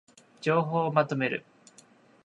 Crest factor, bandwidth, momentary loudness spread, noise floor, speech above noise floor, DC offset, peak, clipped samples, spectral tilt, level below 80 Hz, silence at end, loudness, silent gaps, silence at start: 22 dB; 11 kHz; 7 LU; -58 dBFS; 32 dB; under 0.1%; -8 dBFS; under 0.1%; -7 dB/octave; -76 dBFS; 0.85 s; -28 LUFS; none; 0.4 s